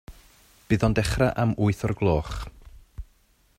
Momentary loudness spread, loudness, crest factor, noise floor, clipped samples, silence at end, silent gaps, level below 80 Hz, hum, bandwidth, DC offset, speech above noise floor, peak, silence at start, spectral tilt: 21 LU; -24 LUFS; 20 dB; -62 dBFS; under 0.1%; 0.55 s; none; -38 dBFS; none; 15 kHz; under 0.1%; 39 dB; -6 dBFS; 0.1 s; -6.5 dB/octave